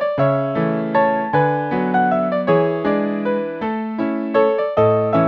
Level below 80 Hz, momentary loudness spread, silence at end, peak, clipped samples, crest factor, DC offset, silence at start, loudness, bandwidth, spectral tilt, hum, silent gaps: -56 dBFS; 6 LU; 0 s; -2 dBFS; under 0.1%; 16 dB; under 0.1%; 0 s; -18 LUFS; 5.8 kHz; -10 dB/octave; none; none